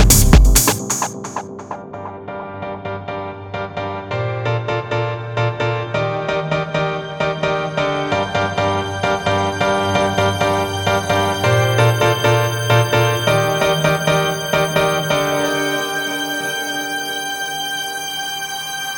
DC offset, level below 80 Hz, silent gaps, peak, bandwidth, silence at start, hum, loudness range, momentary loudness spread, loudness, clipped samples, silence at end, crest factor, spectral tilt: under 0.1%; -26 dBFS; none; 0 dBFS; over 20 kHz; 0 s; none; 8 LU; 13 LU; -18 LUFS; under 0.1%; 0 s; 18 dB; -4 dB/octave